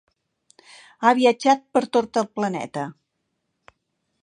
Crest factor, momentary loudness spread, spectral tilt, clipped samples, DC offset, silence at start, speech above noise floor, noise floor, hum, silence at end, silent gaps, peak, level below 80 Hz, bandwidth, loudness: 22 dB; 13 LU; -4.5 dB/octave; under 0.1%; under 0.1%; 1 s; 55 dB; -76 dBFS; none; 1.3 s; none; -2 dBFS; -72 dBFS; 10 kHz; -21 LUFS